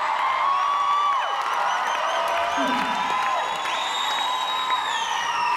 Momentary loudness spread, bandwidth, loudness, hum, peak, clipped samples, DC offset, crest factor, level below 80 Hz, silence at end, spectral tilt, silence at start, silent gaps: 3 LU; 16 kHz; -23 LUFS; none; -12 dBFS; under 0.1%; under 0.1%; 10 dB; -64 dBFS; 0 s; -1 dB/octave; 0 s; none